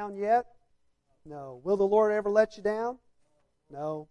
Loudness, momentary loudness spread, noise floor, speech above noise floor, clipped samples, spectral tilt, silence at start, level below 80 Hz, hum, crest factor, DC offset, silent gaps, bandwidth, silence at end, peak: -28 LUFS; 23 LU; -70 dBFS; 43 dB; under 0.1%; -6.5 dB/octave; 0 s; -66 dBFS; none; 18 dB; under 0.1%; none; 8.8 kHz; 0.05 s; -12 dBFS